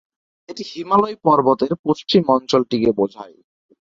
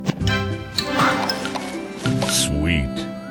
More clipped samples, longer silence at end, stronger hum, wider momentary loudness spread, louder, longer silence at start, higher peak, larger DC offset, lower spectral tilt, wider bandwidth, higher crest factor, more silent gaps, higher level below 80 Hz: neither; first, 0.7 s vs 0 s; neither; first, 15 LU vs 9 LU; first, -18 LUFS vs -21 LUFS; first, 0.5 s vs 0 s; about the same, -2 dBFS vs -4 dBFS; neither; first, -6.5 dB/octave vs -4 dB/octave; second, 7.6 kHz vs 19 kHz; about the same, 18 dB vs 18 dB; first, 1.79-1.84 s vs none; second, -56 dBFS vs -34 dBFS